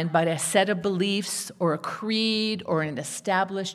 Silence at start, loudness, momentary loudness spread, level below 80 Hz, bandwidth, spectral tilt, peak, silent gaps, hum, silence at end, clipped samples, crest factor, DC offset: 0 s; -25 LUFS; 6 LU; -72 dBFS; 15 kHz; -4 dB/octave; -6 dBFS; none; none; 0 s; under 0.1%; 20 dB; under 0.1%